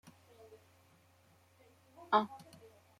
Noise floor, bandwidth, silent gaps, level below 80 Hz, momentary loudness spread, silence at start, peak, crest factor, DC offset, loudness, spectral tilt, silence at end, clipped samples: -68 dBFS; 16.5 kHz; none; -86 dBFS; 27 LU; 2.1 s; -16 dBFS; 26 dB; under 0.1%; -34 LUFS; -5 dB/octave; 0.6 s; under 0.1%